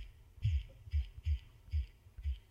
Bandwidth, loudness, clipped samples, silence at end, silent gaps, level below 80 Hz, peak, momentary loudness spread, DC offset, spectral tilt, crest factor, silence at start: 6.8 kHz; -41 LUFS; under 0.1%; 0.1 s; none; -40 dBFS; -24 dBFS; 8 LU; under 0.1%; -6.5 dB/octave; 16 dB; 0 s